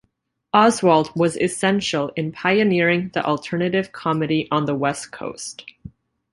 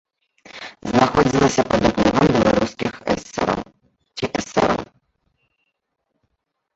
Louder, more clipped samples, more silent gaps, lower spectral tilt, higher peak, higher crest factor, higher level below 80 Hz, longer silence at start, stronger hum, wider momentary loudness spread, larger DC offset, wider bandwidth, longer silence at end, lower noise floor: about the same, -20 LUFS vs -19 LUFS; neither; neither; about the same, -5 dB/octave vs -5.5 dB/octave; about the same, -2 dBFS vs -2 dBFS; about the same, 18 dB vs 20 dB; second, -56 dBFS vs -42 dBFS; about the same, 0.55 s vs 0.55 s; neither; second, 14 LU vs 18 LU; neither; first, 11.5 kHz vs 8.2 kHz; second, 0.45 s vs 1.9 s; second, -69 dBFS vs -75 dBFS